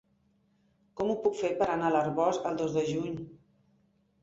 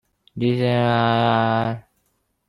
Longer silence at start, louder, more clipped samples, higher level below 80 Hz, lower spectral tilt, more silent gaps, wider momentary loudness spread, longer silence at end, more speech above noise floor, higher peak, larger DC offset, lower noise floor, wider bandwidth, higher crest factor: first, 0.95 s vs 0.35 s; second, -30 LUFS vs -20 LUFS; neither; second, -66 dBFS vs -56 dBFS; second, -6 dB/octave vs -8 dB/octave; neither; about the same, 12 LU vs 11 LU; first, 0.85 s vs 0.7 s; second, 41 dB vs 50 dB; second, -14 dBFS vs -4 dBFS; neither; about the same, -70 dBFS vs -69 dBFS; second, 8 kHz vs 10 kHz; about the same, 18 dB vs 16 dB